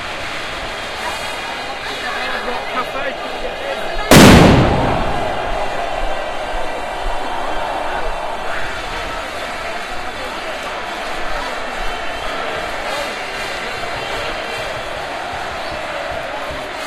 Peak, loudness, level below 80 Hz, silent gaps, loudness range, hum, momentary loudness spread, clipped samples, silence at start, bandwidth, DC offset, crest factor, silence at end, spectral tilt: 0 dBFS; -18 LUFS; -30 dBFS; none; 11 LU; none; 8 LU; 0.2%; 0 s; 14 kHz; under 0.1%; 18 dB; 0 s; -4.5 dB/octave